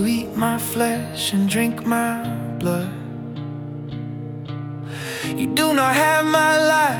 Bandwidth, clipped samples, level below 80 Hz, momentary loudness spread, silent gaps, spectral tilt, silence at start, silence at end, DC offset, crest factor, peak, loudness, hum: 18 kHz; under 0.1%; -56 dBFS; 15 LU; none; -4.5 dB/octave; 0 s; 0 s; under 0.1%; 18 dB; -2 dBFS; -21 LUFS; none